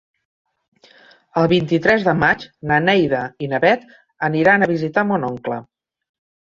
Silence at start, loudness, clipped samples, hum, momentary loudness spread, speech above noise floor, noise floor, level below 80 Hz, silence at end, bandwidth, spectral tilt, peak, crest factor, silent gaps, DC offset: 1.35 s; -18 LUFS; under 0.1%; none; 10 LU; 32 dB; -50 dBFS; -52 dBFS; 0.85 s; 7.4 kHz; -7 dB/octave; -2 dBFS; 18 dB; none; under 0.1%